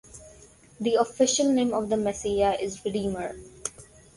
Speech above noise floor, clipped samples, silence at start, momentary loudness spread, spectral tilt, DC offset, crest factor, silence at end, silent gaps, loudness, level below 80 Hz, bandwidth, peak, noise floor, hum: 27 dB; under 0.1%; 0.15 s; 14 LU; -4 dB/octave; under 0.1%; 18 dB; 0.35 s; none; -26 LUFS; -52 dBFS; 11.5 kHz; -10 dBFS; -53 dBFS; none